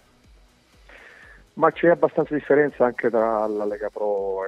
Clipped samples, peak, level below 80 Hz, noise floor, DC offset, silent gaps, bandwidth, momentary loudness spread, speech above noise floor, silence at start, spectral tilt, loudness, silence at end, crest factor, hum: under 0.1%; -4 dBFS; -56 dBFS; -55 dBFS; under 0.1%; none; 6.6 kHz; 8 LU; 34 dB; 1.55 s; -8 dB/octave; -22 LUFS; 0 s; 20 dB; none